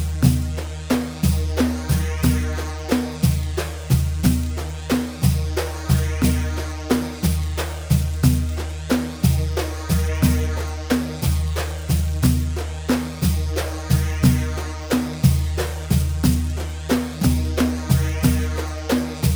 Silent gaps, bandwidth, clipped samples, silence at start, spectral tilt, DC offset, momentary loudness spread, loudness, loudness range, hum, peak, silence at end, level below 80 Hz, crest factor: none; over 20 kHz; under 0.1%; 0 s; -6 dB/octave; under 0.1%; 7 LU; -22 LUFS; 1 LU; none; -2 dBFS; 0 s; -26 dBFS; 18 dB